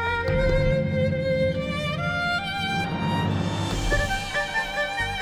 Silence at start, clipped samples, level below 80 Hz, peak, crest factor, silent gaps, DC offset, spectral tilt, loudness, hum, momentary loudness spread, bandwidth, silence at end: 0 s; under 0.1%; -34 dBFS; -10 dBFS; 14 dB; none; under 0.1%; -5.5 dB/octave; -25 LUFS; none; 3 LU; 16.5 kHz; 0 s